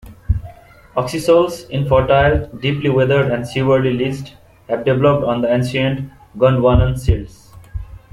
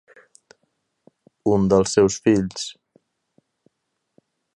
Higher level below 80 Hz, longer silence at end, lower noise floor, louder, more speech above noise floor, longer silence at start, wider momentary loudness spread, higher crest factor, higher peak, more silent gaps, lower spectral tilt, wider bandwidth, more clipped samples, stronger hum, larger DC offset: first, -30 dBFS vs -50 dBFS; second, 0.15 s vs 1.85 s; second, -41 dBFS vs -77 dBFS; first, -16 LUFS vs -20 LUFS; second, 26 dB vs 58 dB; second, 0.05 s vs 1.45 s; about the same, 15 LU vs 13 LU; second, 14 dB vs 20 dB; about the same, -2 dBFS vs -4 dBFS; neither; first, -7 dB/octave vs -5.5 dB/octave; first, 13.5 kHz vs 11 kHz; neither; neither; neither